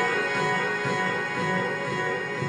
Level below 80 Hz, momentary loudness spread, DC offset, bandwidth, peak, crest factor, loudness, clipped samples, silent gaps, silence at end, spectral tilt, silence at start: -66 dBFS; 3 LU; under 0.1%; 11.5 kHz; -14 dBFS; 12 dB; -26 LUFS; under 0.1%; none; 0 s; -4.5 dB/octave; 0 s